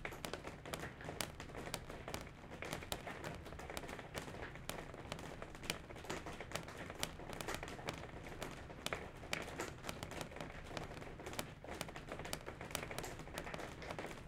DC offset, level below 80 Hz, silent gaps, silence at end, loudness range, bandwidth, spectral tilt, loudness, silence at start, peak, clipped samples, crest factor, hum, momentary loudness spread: under 0.1%; -58 dBFS; none; 0 s; 2 LU; 16.5 kHz; -3.5 dB/octave; -47 LUFS; 0 s; -18 dBFS; under 0.1%; 30 dB; none; 4 LU